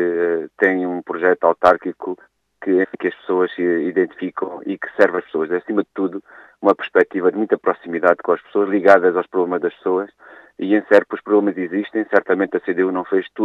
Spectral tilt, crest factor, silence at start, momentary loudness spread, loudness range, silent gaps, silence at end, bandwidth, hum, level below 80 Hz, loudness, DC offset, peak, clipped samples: -7.5 dB/octave; 18 dB; 0 s; 11 LU; 3 LU; none; 0 s; 7.6 kHz; none; -66 dBFS; -18 LUFS; under 0.1%; 0 dBFS; under 0.1%